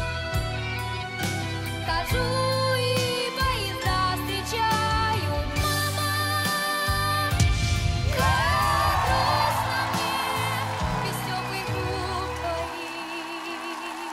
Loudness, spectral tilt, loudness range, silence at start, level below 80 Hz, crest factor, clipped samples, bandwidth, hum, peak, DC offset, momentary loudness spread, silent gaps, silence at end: -25 LUFS; -4 dB/octave; 5 LU; 0 s; -36 dBFS; 16 dB; under 0.1%; 16 kHz; none; -10 dBFS; under 0.1%; 8 LU; none; 0 s